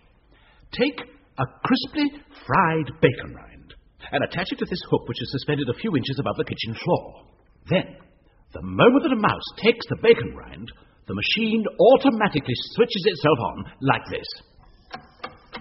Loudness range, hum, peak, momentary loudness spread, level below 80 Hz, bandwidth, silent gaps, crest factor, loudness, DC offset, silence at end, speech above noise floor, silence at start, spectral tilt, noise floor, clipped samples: 6 LU; none; -2 dBFS; 20 LU; -52 dBFS; 6 kHz; none; 22 dB; -22 LUFS; under 0.1%; 0 s; 33 dB; 0.75 s; -4 dB/octave; -56 dBFS; under 0.1%